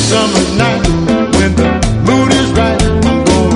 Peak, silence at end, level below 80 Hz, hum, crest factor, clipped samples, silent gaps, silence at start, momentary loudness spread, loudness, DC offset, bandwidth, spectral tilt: 0 dBFS; 0 s; -20 dBFS; none; 10 dB; under 0.1%; none; 0 s; 2 LU; -11 LUFS; under 0.1%; 11 kHz; -5 dB/octave